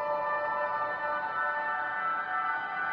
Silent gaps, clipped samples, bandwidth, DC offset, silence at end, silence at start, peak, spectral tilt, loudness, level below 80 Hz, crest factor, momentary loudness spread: none; under 0.1%; 6.6 kHz; under 0.1%; 0 s; 0 s; -20 dBFS; -5.5 dB/octave; -31 LUFS; -74 dBFS; 12 dB; 1 LU